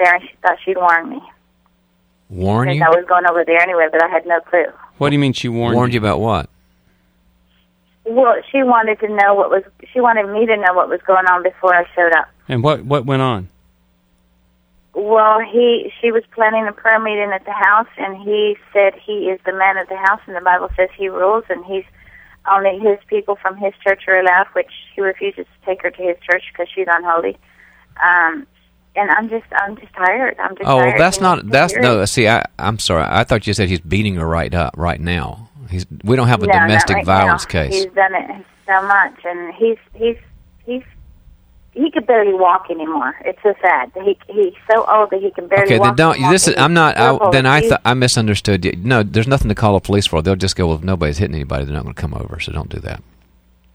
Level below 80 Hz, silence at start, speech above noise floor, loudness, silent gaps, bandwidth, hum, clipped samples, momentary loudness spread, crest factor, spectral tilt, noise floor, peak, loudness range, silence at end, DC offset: -38 dBFS; 0 s; 44 dB; -15 LUFS; none; over 20 kHz; none; under 0.1%; 12 LU; 16 dB; -5 dB/octave; -58 dBFS; 0 dBFS; 5 LU; 0.75 s; under 0.1%